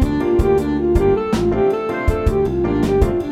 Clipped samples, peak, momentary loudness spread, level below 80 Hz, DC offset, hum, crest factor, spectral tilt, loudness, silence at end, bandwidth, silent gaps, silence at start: under 0.1%; -2 dBFS; 3 LU; -24 dBFS; under 0.1%; none; 14 dB; -8 dB/octave; -17 LUFS; 0 s; 15 kHz; none; 0 s